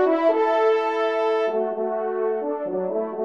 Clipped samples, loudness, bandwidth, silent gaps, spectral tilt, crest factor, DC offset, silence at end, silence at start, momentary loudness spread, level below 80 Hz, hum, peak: under 0.1%; -23 LUFS; 7 kHz; none; -6 dB/octave; 14 dB; 0.1%; 0 s; 0 s; 7 LU; -78 dBFS; none; -8 dBFS